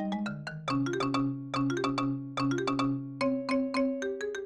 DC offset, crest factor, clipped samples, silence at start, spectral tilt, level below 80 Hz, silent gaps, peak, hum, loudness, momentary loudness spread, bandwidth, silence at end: under 0.1%; 14 dB; under 0.1%; 0 s; -6 dB/octave; -60 dBFS; none; -16 dBFS; none; -31 LUFS; 4 LU; 9.6 kHz; 0 s